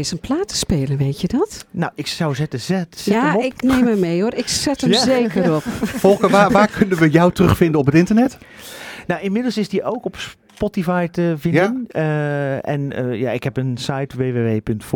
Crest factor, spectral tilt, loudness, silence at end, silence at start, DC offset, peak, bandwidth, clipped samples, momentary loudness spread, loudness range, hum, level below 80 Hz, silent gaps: 18 dB; -5.5 dB/octave; -18 LUFS; 0 s; 0 s; under 0.1%; 0 dBFS; 18.5 kHz; under 0.1%; 10 LU; 6 LU; none; -42 dBFS; none